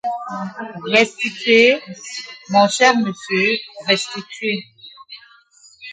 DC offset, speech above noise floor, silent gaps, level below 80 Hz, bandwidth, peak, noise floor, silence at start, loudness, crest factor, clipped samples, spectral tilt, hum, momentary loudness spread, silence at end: under 0.1%; 32 dB; none; -70 dBFS; 9.4 kHz; 0 dBFS; -50 dBFS; 0.05 s; -17 LUFS; 18 dB; under 0.1%; -3.5 dB/octave; none; 17 LU; 0 s